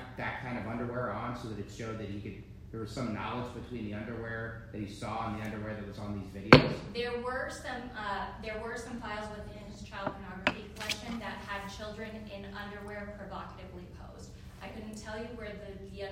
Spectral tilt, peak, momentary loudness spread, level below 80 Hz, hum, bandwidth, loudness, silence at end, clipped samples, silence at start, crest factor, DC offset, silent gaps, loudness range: -5.5 dB/octave; -2 dBFS; 11 LU; -52 dBFS; none; 16 kHz; -35 LUFS; 0 s; under 0.1%; 0 s; 34 dB; under 0.1%; none; 14 LU